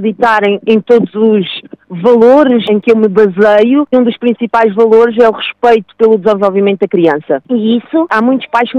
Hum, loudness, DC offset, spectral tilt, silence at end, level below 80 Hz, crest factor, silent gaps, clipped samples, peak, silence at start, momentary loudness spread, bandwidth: none; -9 LUFS; under 0.1%; -7.5 dB/octave; 0 s; -54 dBFS; 8 dB; none; 1%; 0 dBFS; 0 s; 6 LU; 7 kHz